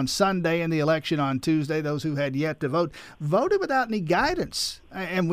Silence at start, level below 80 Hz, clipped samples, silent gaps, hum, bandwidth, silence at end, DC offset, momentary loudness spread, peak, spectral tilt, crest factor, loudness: 0 s; -52 dBFS; under 0.1%; none; none; 15.5 kHz; 0 s; under 0.1%; 6 LU; -10 dBFS; -5.5 dB/octave; 16 dB; -25 LUFS